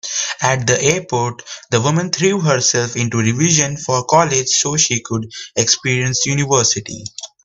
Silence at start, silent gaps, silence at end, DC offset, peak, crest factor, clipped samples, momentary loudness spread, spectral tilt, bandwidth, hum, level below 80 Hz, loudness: 0.05 s; none; 0.2 s; under 0.1%; 0 dBFS; 16 dB; under 0.1%; 10 LU; -3 dB/octave; 8.6 kHz; none; -52 dBFS; -15 LUFS